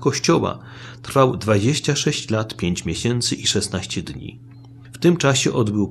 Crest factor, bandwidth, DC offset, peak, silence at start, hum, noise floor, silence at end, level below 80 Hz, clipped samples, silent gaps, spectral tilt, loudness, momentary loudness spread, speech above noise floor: 18 dB; 14.5 kHz; under 0.1%; -2 dBFS; 0 s; none; -40 dBFS; 0 s; -48 dBFS; under 0.1%; none; -4.5 dB/octave; -20 LUFS; 16 LU; 20 dB